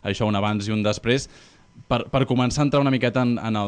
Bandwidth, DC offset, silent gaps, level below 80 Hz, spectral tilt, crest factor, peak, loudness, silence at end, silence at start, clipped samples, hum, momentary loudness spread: 10 kHz; under 0.1%; none; -46 dBFS; -6 dB/octave; 14 dB; -8 dBFS; -22 LUFS; 0 s; 0.05 s; under 0.1%; none; 5 LU